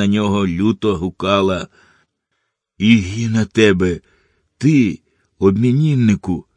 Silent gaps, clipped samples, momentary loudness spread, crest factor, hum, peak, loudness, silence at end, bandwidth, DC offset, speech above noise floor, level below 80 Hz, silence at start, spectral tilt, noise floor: none; under 0.1%; 7 LU; 16 dB; none; 0 dBFS; -16 LUFS; 0.15 s; 10 kHz; under 0.1%; 57 dB; -46 dBFS; 0 s; -6.5 dB/octave; -72 dBFS